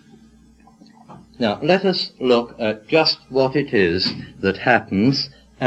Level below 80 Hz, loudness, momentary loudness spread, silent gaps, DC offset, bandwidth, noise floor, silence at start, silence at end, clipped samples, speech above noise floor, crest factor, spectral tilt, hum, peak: -54 dBFS; -19 LUFS; 7 LU; none; under 0.1%; 8.6 kHz; -50 dBFS; 1.1 s; 0 s; under 0.1%; 31 dB; 20 dB; -6 dB/octave; none; -2 dBFS